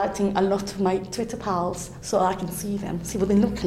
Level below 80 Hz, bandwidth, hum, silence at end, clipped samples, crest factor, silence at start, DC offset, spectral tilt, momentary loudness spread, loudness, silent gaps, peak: -46 dBFS; 16 kHz; none; 0 s; under 0.1%; 16 dB; 0 s; under 0.1%; -5.5 dB/octave; 8 LU; -25 LUFS; none; -8 dBFS